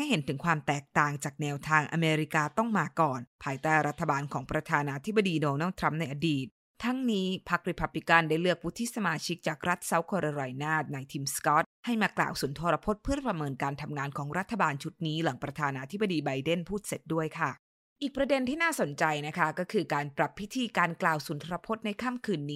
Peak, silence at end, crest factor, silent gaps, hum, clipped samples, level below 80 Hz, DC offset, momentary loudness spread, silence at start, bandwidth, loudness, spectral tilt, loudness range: -6 dBFS; 0 s; 24 dB; 3.27-3.39 s, 6.51-6.74 s, 11.66-11.83 s, 17.59-17.96 s; none; under 0.1%; -56 dBFS; under 0.1%; 7 LU; 0 s; 16 kHz; -30 LUFS; -5 dB/octave; 3 LU